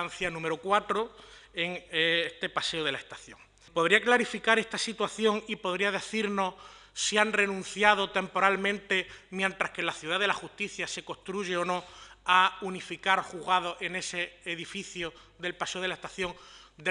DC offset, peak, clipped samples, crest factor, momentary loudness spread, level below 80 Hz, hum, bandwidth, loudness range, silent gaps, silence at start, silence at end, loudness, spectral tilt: under 0.1%; -6 dBFS; under 0.1%; 24 dB; 13 LU; -64 dBFS; none; 11.5 kHz; 4 LU; none; 0 s; 0 s; -29 LUFS; -3 dB/octave